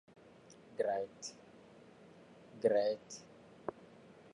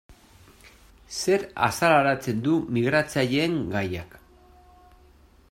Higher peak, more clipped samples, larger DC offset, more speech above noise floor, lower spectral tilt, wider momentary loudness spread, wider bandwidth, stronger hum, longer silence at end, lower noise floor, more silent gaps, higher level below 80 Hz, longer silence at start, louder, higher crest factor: second, -18 dBFS vs -6 dBFS; neither; neither; second, 25 dB vs 31 dB; about the same, -4 dB/octave vs -5 dB/octave; first, 26 LU vs 10 LU; second, 11 kHz vs 16 kHz; neither; second, 0.65 s vs 1.35 s; first, -60 dBFS vs -55 dBFS; neither; second, -82 dBFS vs -56 dBFS; first, 0.5 s vs 0.1 s; second, -38 LUFS vs -24 LUFS; about the same, 22 dB vs 20 dB